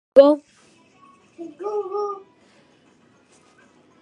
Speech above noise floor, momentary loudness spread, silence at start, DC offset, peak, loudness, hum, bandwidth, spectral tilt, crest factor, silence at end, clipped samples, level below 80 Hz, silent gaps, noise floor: 39 dB; 25 LU; 0.15 s; under 0.1%; 0 dBFS; -20 LUFS; none; 9.4 kHz; -5.5 dB/octave; 22 dB; 1.85 s; under 0.1%; -72 dBFS; none; -57 dBFS